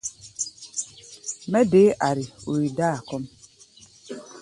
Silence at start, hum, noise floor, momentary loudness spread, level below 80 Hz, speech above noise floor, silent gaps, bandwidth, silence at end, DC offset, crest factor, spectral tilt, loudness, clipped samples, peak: 0.05 s; none; -52 dBFS; 21 LU; -60 dBFS; 31 dB; none; 11.5 kHz; 0 s; under 0.1%; 18 dB; -5 dB/octave; -24 LUFS; under 0.1%; -6 dBFS